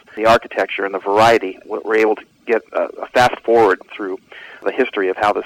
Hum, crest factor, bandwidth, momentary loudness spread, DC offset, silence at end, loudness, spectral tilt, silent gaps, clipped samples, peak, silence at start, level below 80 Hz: none; 14 dB; 16.5 kHz; 13 LU; under 0.1%; 0 s; -17 LUFS; -4.5 dB/octave; none; under 0.1%; -4 dBFS; 0.15 s; -52 dBFS